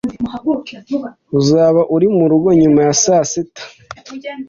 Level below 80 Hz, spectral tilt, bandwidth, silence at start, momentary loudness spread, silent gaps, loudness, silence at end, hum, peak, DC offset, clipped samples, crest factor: -50 dBFS; -5.5 dB/octave; 7.6 kHz; 0.05 s; 18 LU; none; -14 LUFS; 0.05 s; none; -2 dBFS; under 0.1%; under 0.1%; 12 dB